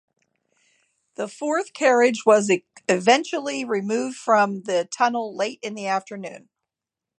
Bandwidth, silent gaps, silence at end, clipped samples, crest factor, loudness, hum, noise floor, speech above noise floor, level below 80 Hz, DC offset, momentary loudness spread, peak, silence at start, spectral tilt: 11 kHz; none; 0.8 s; under 0.1%; 20 dB; -22 LUFS; none; -88 dBFS; 66 dB; -78 dBFS; under 0.1%; 14 LU; -4 dBFS; 1.2 s; -3.5 dB/octave